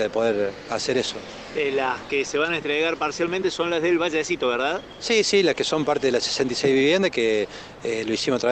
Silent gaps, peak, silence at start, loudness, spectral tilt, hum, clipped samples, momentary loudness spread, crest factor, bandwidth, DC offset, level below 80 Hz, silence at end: none; -8 dBFS; 0 s; -23 LUFS; -3.5 dB/octave; none; under 0.1%; 8 LU; 14 dB; 9 kHz; under 0.1%; -56 dBFS; 0 s